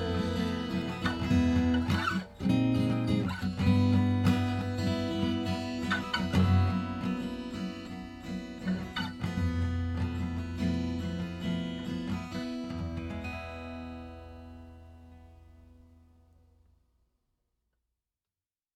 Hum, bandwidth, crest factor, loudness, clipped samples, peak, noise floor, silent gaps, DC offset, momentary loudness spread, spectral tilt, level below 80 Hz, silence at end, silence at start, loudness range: none; 12.5 kHz; 18 dB; -31 LUFS; under 0.1%; -14 dBFS; under -90 dBFS; none; under 0.1%; 15 LU; -7 dB/octave; -48 dBFS; 3 s; 0 s; 13 LU